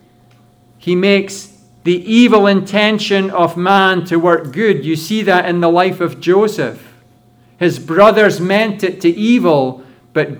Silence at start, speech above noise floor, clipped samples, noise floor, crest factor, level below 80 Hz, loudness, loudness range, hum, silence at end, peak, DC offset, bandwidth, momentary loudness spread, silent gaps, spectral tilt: 0.85 s; 36 dB; under 0.1%; -48 dBFS; 14 dB; -60 dBFS; -13 LUFS; 2 LU; none; 0 s; 0 dBFS; under 0.1%; over 20 kHz; 9 LU; none; -5.5 dB/octave